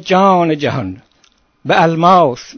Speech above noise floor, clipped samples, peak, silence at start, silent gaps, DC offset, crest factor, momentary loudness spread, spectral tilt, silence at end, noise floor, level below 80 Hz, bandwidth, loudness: 42 dB; 0.1%; 0 dBFS; 0.05 s; none; under 0.1%; 14 dB; 14 LU; -6.5 dB/octave; 0.15 s; -54 dBFS; -50 dBFS; 8 kHz; -12 LUFS